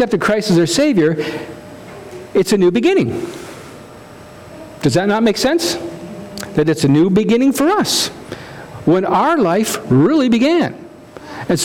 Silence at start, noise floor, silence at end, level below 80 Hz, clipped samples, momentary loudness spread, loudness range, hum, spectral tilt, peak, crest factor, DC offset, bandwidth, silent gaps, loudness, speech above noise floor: 0 s; -37 dBFS; 0 s; -48 dBFS; under 0.1%; 20 LU; 4 LU; none; -5 dB/octave; -4 dBFS; 12 dB; under 0.1%; 17.5 kHz; none; -15 LUFS; 23 dB